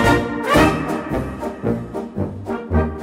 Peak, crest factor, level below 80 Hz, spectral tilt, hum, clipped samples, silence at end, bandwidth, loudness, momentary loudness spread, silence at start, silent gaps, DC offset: -2 dBFS; 16 dB; -32 dBFS; -6 dB/octave; none; under 0.1%; 0 s; 16 kHz; -20 LUFS; 12 LU; 0 s; none; under 0.1%